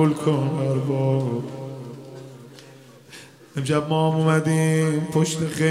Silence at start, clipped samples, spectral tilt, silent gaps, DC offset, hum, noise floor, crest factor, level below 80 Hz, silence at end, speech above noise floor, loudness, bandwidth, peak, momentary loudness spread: 0 s; under 0.1%; -6.5 dB/octave; none; under 0.1%; none; -46 dBFS; 16 dB; -64 dBFS; 0 s; 26 dB; -22 LUFS; 14.5 kHz; -8 dBFS; 22 LU